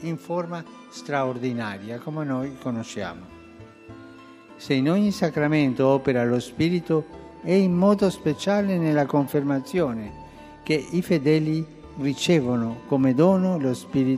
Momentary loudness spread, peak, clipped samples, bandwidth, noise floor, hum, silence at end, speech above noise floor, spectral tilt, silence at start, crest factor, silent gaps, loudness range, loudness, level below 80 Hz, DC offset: 16 LU; -6 dBFS; under 0.1%; 15 kHz; -46 dBFS; none; 0 s; 23 dB; -7 dB/octave; 0 s; 18 dB; none; 8 LU; -23 LUFS; -58 dBFS; under 0.1%